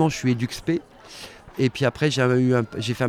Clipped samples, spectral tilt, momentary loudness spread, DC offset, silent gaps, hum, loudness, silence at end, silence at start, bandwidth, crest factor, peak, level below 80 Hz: under 0.1%; -6 dB/octave; 19 LU; under 0.1%; none; none; -23 LUFS; 0 s; 0 s; 15.5 kHz; 16 dB; -6 dBFS; -52 dBFS